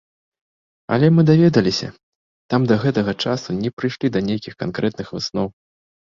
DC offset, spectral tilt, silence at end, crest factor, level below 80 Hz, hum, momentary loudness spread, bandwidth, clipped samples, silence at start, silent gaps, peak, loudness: under 0.1%; -7 dB/octave; 0.55 s; 18 dB; -52 dBFS; none; 12 LU; 7.4 kHz; under 0.1%; 0.9 s; 2.03-2.49 s, 3.73-3.77 s; -2 dBFS; -19 LUFS